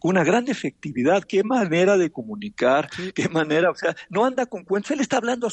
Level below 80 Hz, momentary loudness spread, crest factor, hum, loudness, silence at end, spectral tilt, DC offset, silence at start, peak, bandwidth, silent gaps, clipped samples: -64 dBFS; 9 LU; 16 dB; none; -22 LUFS; 0 s; -5.5 dB/octave; under 0.1%; 0.05 s; -6 dBFS; 8.8 kHz; none; under 0.1%